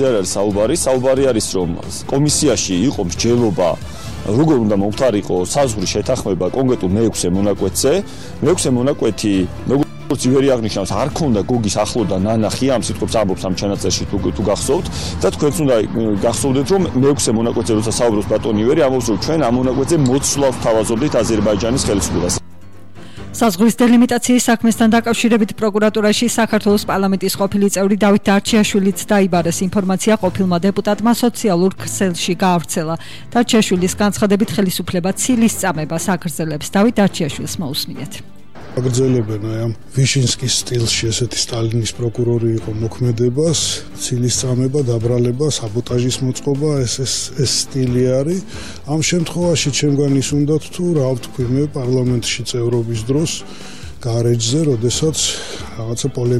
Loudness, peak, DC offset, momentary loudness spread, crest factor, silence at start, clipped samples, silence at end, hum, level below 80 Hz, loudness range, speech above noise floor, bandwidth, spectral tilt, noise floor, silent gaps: -16 LUFS; -4 dBFS; 2%; 7 LU; 12 dB; 0 s; under 0.1%; 0 s; none; -38 dBFS; 3 LU; 25 dB; 15.5 kHz; -5 dB/octave; -41 dBFS; none